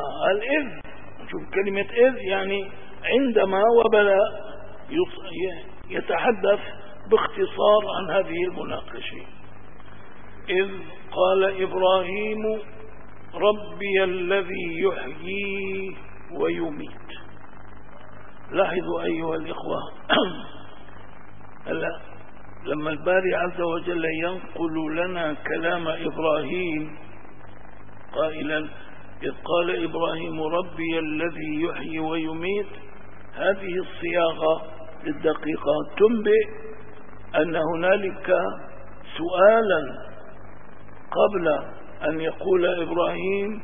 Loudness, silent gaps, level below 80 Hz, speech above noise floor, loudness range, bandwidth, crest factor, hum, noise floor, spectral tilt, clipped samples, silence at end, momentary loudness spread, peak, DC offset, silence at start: -24 LUFS; none; -54 dBFS; 23 dB; 7 LU; 3.7 kHz; 22 dB; none; -46 dBFS; -9.5 dB/octave; under 0.1%; 0 s; 20 LU; -2 dBFS; 2%; 0 s